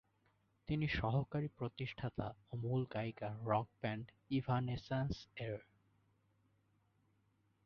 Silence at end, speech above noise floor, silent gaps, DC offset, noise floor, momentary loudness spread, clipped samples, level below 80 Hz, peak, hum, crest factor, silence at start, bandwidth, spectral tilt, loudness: 2.05 s; 37 dB; none; under 0.1%; -78 dBFS; 9 LU; under 0.1%; -60 dBFS; -22 dBFS; none; 20 dB; 0.7 s; 6.6 kHz; -6 dB/octave; -41 LUFS